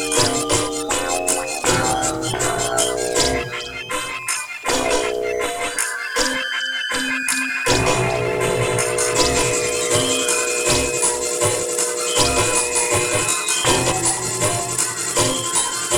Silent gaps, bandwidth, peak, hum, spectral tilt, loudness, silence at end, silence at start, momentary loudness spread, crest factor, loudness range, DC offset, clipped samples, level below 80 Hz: none; over 20 kHz; -2 dBFS; none; -2 dB/octave; -18 LUFS; 0 s; 0 s; 5 LU; 18 dB; 4 LU; under 0.1%; under 0.1%; -40 dBFS